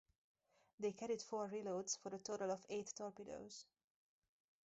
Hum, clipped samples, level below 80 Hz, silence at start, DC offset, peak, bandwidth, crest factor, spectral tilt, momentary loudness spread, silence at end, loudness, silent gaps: none; under 0.1%; -86 dBFS; 0.8 s; under 0.1%; -30 dBFS; 8 kHz; 18 dB; -4 dB/octave; 10 LU; 1.05 s; -47 LUFS; none